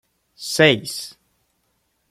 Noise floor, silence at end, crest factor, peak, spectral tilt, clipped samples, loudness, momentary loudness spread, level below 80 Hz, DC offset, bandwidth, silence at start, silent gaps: -69 dBFS; 1 s; 22 dB; -2 dBFS; -3.5 dB/octave; under 0.1%; -18 LUFS; 19 LU; -62 dBFS; under 0.1%; 16 kHz; 0.4 s; none